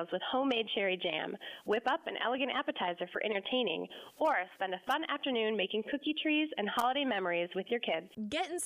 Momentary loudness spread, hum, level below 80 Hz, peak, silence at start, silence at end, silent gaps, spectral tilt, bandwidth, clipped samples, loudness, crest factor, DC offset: 6 LU; none; -78 dBFS; -20 dBFS; 0 s; 0 s; none; -3.5 dB/octave; 15.5 kHz; under 0.1%; -34 LUFS; 14 dB; under 0.1%